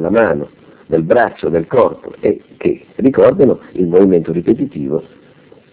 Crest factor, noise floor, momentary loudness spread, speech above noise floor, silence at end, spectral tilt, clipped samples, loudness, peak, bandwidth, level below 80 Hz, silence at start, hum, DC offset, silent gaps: 14 dB; -44 dBFS; 9 LU; 31 dB; 0.7 s; -12 dB/octave; 0.3%; -14 LUFS; 0 dBFS; 4 kHz; -44 dBFS; 0 s; none; under 0.1%; none